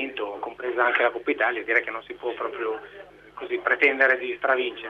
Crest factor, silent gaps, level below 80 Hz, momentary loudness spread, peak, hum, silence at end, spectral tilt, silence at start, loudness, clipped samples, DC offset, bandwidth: 20 dB; none; -66 dBFS; 13 LU; -4 dBFS; 50 Hz at -65 dBFS; 0 s; -4.5 dB/octave; 0 s; -24 LUFS; under 0.1%; under 0.1%; 7 kHz